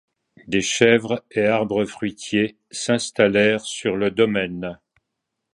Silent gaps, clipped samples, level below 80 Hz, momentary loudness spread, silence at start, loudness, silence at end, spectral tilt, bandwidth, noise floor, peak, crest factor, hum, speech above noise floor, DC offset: none; under 0.1%; -56 dBFS; 11 LU; 0.45 s; -20 LUFS; 0.8 s; -4 dB/octave; 11.5 kHz; -80 dBFS; 0 dBFS; 20 dB; none; 59 dB; under 0.1%